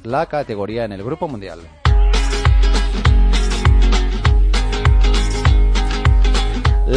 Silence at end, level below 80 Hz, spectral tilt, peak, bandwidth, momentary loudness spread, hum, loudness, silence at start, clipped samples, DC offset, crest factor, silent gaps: 0 s; -14 dBFS; -5.5 dB/octave; -2 dBFS; 10 kHz; 9 LU; none; -17 LUFS; 0.05 s; under 0.1%; under 0.1%; 12 dB; none